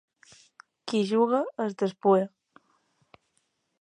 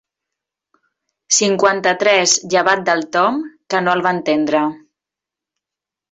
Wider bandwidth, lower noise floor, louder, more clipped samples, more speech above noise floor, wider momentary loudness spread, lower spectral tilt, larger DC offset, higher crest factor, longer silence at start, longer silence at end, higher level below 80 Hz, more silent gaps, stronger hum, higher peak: first, 10 kHz vs 8.4 kHz; second, -75 dBFS vs -86 dBFS; second, -26 LUFS vs -15 LUFS; neither; second, 50 dB vs 71 dB; first, 10 LU vs 6 LU; first, -6.5 dB/octave vs -2.5 dB/octave; neither; about the same, 20 dB vs 18 dB; second, 0.85 s vs 1.3 s; first, 1.55 s vs 1.35 s; second, -82 dBFS vs -64 dBFS; neither; neither; second, -8 dBFS vs 0 dBFS